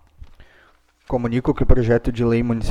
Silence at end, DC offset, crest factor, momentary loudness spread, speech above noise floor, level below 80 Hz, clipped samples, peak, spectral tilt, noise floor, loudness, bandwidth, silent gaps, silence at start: 0 s; under 0.1%; 18 dB; 6 LU; 38 dB; -24 dBFS; under 0.1%; 0 dBFS; -8.5 dB/octave; -55 dBFS; -20 LUFS; 7.4 kHz; none; 1.1 s